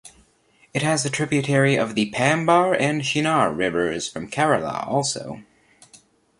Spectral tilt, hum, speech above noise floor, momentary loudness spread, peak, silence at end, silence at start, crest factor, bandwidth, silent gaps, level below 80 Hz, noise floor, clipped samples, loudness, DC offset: -4.5 dB/octave; none; 38 dB; 10 LU; -4 dBFS; 0.45 s; 0.05 s; 18 dB; 11.5 kHz; none; -58 dBFS; -59 dBFS; under 0.1%; -21 LUFS; under 0.1%